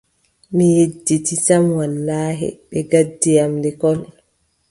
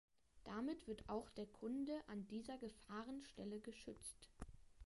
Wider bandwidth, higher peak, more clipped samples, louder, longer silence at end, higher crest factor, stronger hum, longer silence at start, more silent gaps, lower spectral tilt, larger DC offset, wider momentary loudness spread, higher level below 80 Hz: about the same, 11.5 kHz vs 11.5 kHz; first, 0 dBFS vs -34 dBFS; neither; first, -17 LUFS vs -51 LUFS; first, 0.65 s vs 0 s; about the same, 16 dB vs 16 dB; neither; first, 0.5 s vs 0.35 s; neither; about the same, -6 dB/octave vs -5 dB/octave; neither; about the same, 9 LU vs 11 LU; first, -54 dBFS vs -68 dBFS